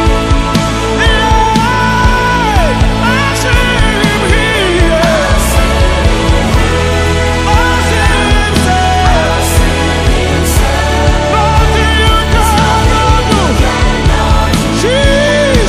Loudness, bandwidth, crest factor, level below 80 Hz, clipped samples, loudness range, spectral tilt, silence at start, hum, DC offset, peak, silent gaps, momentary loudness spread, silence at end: -10 LUFS; 15.5 kHz; 8 dB; -14 dBFS; 0.4%; 1 LU; -4.5 dB/octave; 0 s; none; under 0.1%; 0 dBFS; none; 2 LU; 0 s